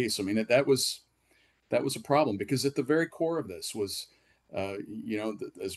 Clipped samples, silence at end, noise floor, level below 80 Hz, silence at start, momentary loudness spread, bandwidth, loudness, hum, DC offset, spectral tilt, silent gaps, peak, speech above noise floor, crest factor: under 0.1%; 0 s; -68 dBFS; -70 dBFS; 0 s; 12 LU; 12.5 kHz; -30 LUFS; none; under 0.1%; -4.5 dB/octave; none; -12 dBFS; 38 dB; 18 dB